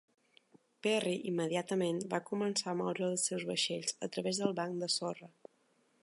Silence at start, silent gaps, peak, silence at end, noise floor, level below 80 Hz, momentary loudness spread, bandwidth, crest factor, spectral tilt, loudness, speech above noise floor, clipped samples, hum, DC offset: 0.85 s; none; -16 dBFS; 0.75 s; -73 dBFS; -86 dBFS; 4 LU; 11.5 kHz; 20 dB; -3.5 dB/octave; -35 LUFS; 38 dB; under 0.1%; none; under 0.1%